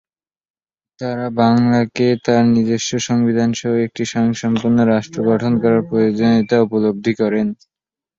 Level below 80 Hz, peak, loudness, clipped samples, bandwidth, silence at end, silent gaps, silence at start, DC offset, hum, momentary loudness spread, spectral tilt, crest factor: -54 dBFS; -2 dBFS; -16 LUFS; under 0.1%; 7.6 kHz; 0.65 s; none; 1 s; under 0.1%; none; 7 LU; -6 dB/octave; 14 dB